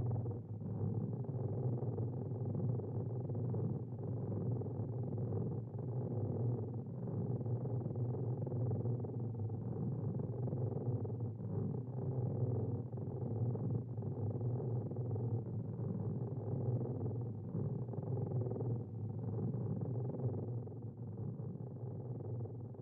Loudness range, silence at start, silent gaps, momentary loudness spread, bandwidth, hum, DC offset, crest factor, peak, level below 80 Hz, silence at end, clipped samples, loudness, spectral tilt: 1 LU; 0 s; none; 5 LU; 1.8 kHz; none; under 0.1%; 14 dB; -26 dBFS; -66 dBFS; 0 s; under 0.1%; -41 LUFS; -13 dB/octave